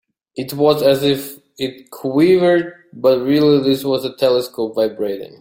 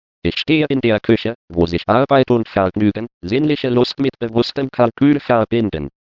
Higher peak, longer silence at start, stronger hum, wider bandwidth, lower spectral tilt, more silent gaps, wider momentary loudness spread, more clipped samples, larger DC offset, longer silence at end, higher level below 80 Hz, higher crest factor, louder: about the same, -2 dBFS vs 0 dBFS; about the same, 0.35 s vs 0.25 s; neither; first, 17 kHz vs 6 kHz; second, -6 dB/octave vs -8 dB/octave; second, none vs 1.35-1.48 s, 3.14-3.21 s; first, 14 LU vs 7 LU; neither; neither; about the same, 0.15 s vs 0.2 s; second, -58 dBFS vs -46 dBFS; about the same, 14 dB vs 16 dB; about the same, -16 LUFS vs -17 LUFS